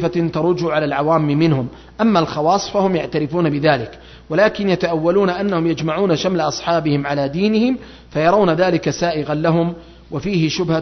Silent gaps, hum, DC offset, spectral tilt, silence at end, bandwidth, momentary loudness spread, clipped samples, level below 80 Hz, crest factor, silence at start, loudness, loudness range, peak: none; none; under 0.1%; -6.5 dB/octave; 0 s; 6.4 kHz; 6 LU; under 0.1%; -46 dBFS; 16 dB; 0 s; -17 LUFS; 1 LU; -2 dBFS